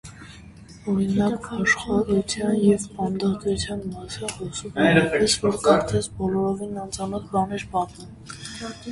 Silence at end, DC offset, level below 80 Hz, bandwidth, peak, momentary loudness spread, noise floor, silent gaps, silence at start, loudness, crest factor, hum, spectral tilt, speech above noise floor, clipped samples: 0 s; under 0.1%; -46 dBFS; 11.5 kHz; -4 dBFS; 15 LU; -44 dBFS; none; 0.05 s; -23 LUFS; 20 dB; none; -5 dB/octave; 21 dB; under 0.1%